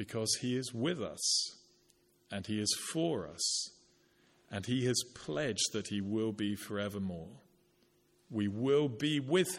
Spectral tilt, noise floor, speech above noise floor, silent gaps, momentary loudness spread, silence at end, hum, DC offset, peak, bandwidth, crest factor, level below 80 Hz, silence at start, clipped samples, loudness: -3.5 dB/octave; -71 dBFS; 36 dB; none; 11 LU; 0 s; none; under 0.1%; -16 dBFS; 16.5 kHz; 20 dB; -72 dBFS; 0 s; under 0.1%; -35 LUFS